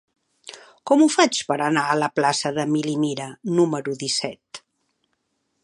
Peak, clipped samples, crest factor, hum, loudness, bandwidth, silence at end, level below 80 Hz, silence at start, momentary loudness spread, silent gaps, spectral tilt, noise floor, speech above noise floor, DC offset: -2 dBFS; under 0.1%; 20 dB; none; -21 LUFS; 11.5 kHz; 1.05 s; -72 dBFS; 0.45 s; 23 LU; none; -4 dB/octave; -73 dBFS; 52 dB; under 0.1%